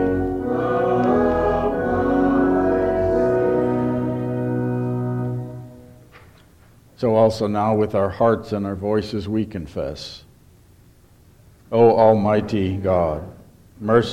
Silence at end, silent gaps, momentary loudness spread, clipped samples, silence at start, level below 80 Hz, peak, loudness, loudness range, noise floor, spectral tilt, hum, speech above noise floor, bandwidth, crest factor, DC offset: 0 s; none; 12 LU; under 0.1%; 0 s; -42 dBFS; -2 dBFS; -20 LUFS; 6 LU; -51 dBFS; -8 dB/octave; none; 32 dB; 13 kHz; 18 dB; under 0.1%